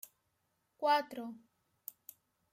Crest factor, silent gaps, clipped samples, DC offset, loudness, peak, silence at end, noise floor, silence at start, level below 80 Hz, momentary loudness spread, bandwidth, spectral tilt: 20 dB; none; under 0.1%; under 0.1%; -35 LUFS; -20 dBFS; 1.2 s; -81 dBFS; 0.8 s; under -90 dBFS; 24 LU; 16.5 kHz; -2.5 dB/octave